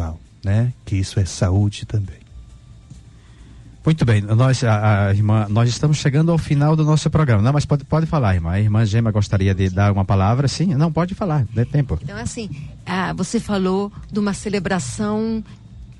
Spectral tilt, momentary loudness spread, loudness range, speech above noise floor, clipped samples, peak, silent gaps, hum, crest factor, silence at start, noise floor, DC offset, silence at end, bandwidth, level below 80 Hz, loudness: -6.5 dB/octave; 9 LU; 6 LU; 25 dB; under 0.1%; -6 dBFS; none; none; 12 dB; 0 s; -43 dBFS; under 0.1%; 0.05 s; 11 kHz; -38 dBFS; -19 LUFS